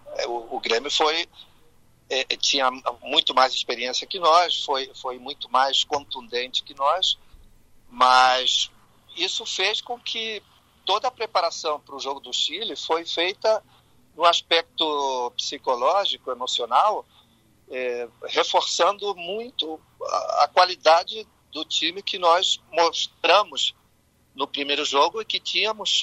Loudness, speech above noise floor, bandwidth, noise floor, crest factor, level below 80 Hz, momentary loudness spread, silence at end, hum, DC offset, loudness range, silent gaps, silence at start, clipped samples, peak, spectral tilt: -22 LUFS; 39 dB; 13 kHz; -62 dBFS; 22 dB; -62 dBFS; 12 LU; 0 s; none; under 0.1%; 4 LU; none; 0.05 s; under 0.1%; -2 dBFS; -0.5 dB/octave